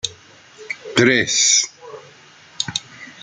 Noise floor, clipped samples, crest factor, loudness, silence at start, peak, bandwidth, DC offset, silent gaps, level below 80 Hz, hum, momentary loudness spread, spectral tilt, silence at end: -46 dBFS; under 0.1%; 20 dB; -17 LUFS; 0.05 s; -2 dBFS; 11 kHz; under 0.1%; none; -62 dBFS; none; 25 LU; -1.5 dB/octave; 0.1 s